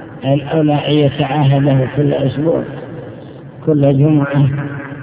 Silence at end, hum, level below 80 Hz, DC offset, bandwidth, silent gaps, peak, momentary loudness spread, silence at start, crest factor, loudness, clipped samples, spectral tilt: 0 s; none; -44 dBFS; under 0.1%; 4 kHz; none; 0 dBFS; 17 LU; 0 s; 14 dB; -14 LUFS; under 0.1%; -12 dB/octave